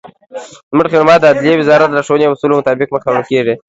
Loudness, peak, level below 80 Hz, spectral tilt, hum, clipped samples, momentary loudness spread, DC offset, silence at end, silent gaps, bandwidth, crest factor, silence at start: -11 LUFS; 0 dBFS; -52 dBFS; -6 dB/octave; none; 0.2%; 19 LU; under 0.1%; 0.1 s; 0.63-0.71 s; 8 kHz; 12 dB; 0.05 s